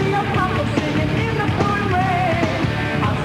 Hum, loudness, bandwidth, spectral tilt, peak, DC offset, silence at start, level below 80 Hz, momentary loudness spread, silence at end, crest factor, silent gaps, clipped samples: none; -19 LUFS; 14 kHz; -6.5 dB/octave; -4 dBFS; under 0.1%; 0 s; -36 dBFS; 2 LU; 0 s; 14 dB; none; under 0.1%